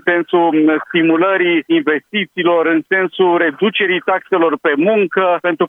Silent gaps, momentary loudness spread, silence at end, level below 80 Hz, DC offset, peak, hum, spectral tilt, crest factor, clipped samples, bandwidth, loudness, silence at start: none; 4 LU; 0 s; -70 dBFS; under 0.1%; 0 dBFS; none; -7.5 dB/octave; 14 dB; under 0.1%; 3.9 kHz; -14 LUFS; 0.05 s